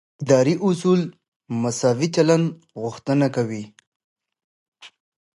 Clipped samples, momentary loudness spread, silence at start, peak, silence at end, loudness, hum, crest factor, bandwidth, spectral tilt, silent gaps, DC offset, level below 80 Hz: under 0.1%; 14 LU; 0.2 s; -4 dBFS; 0.5 s; -21 LUFS; none; 20 dB; 11.5 kHz; -6 dB/octave; 1.28-1.40 s, 3.87-4.16 s, 4.44-4.72 s; under 0.1%; -66 dBFS